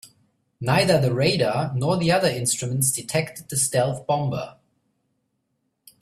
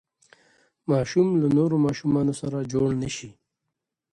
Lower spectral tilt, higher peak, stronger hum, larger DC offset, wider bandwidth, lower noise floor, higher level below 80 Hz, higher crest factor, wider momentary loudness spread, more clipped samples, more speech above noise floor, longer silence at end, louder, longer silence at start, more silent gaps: second, -4 dB/octave vs -7 dB/octave; first, -6 dBFS vs -10 dBFS; neither; neither; first, 15.5 kHz vs 11 kHz; second, -74 dBFS vs -83 dBFS; about the same, -56 dBFS vs -56 dBFS; about the same, 18 dB vs 16 dB; about the same, 8 LU vs 10 LU; neither; second, 52 dB vs 60 dB; first, 1.5 s vs 0.8 s; about the same, -22 LUFS vs -24 LUFS; second, 0.05 s vs 0.9 s; neither